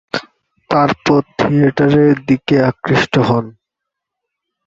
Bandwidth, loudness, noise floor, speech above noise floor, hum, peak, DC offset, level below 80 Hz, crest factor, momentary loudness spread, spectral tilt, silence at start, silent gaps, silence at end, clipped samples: 7.6 kHz; -14 LUFS; -80 dBFS; 67 dB; none; 0 dBFS; under 0.1%; -48 dBFS; 14 dB; 7 LU; -7 dB/octave; 0.15 s; none; 1.15 s; under 0.1%